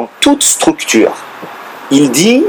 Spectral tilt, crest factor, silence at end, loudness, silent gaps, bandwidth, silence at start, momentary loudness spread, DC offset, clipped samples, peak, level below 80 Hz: -3 dB/octave; 10 dB; 0 s; -9 LUFS; none; over 20 kHz; 0 s; 19 LU; under 0.1%; 0.2%; 0 dBFS; -48 dBFS